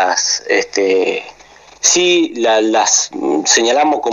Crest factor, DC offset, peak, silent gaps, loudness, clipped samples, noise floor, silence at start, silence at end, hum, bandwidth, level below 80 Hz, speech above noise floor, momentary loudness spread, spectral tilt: 14 dB; under 0.1%; 0 dBFS; none; -13 LUFS; under 0.1%; -42 dBFS; 0 s; 0 s; none; 13 kHz; -58 dBFS; 29 dB; 5 LU; -0.5 dB/octave